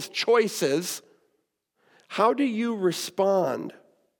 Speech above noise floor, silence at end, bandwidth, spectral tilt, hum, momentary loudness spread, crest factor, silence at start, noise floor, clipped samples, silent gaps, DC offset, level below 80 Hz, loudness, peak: 50 dB; 0.5 s; 19 kHz; -4 dB/octave; none; 12 LU; 18 dB; 0 s; -75 dBFS; under 0.1%; none; under 0.1%; -90 dBFS; -25 LUFS; -8 dBFS